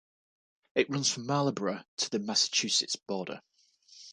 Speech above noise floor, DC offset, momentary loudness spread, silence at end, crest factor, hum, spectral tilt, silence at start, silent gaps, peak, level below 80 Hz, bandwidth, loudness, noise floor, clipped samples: 29 dB; under 0.1%; 11 LU; 0 s; 22 dB; none; -2.5 dB/octave; 0.75 s; 1.88-1.97 s; -10 dBFS; -78 dBFS; 11 kHz; -30 LUFS; -60 dBFS; under 0.1%